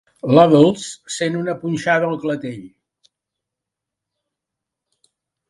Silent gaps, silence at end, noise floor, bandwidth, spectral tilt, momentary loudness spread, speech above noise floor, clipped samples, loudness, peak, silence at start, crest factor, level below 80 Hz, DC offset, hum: none; 2.8 s; -84 dBFS; 11.5 kHz; -6 dB/octave; 16 LU; 67 dB; under 0.1%; -17 LUFS; 0 dBFS; 0.25 s; 20 dB; -60 dBFS; under 0.1%; none